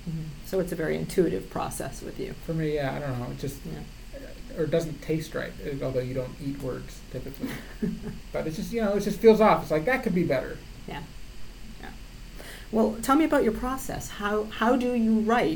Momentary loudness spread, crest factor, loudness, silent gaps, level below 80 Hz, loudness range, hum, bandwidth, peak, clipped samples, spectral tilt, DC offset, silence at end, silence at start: 21 LU; 22 dB; -27 LUFS; none; -44 dBFS; 8 LU; none; 19 kHz; -6 dBFS; under 0.1%; -6 dB/octave; under 0.1%; 0 s; 0 s